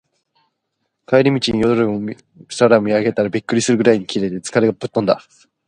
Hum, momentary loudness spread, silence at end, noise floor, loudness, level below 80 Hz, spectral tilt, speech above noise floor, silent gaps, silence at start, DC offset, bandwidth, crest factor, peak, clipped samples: none; 8 LU; 0.5 s; -73 dBFS; -17 LUFS; -50 dBFS; -5.5 dB/octave; 57 dB; none; 1.1 s; under 0.1%; 11 kHz; 18 dB; 0 dBFS; under 0.1%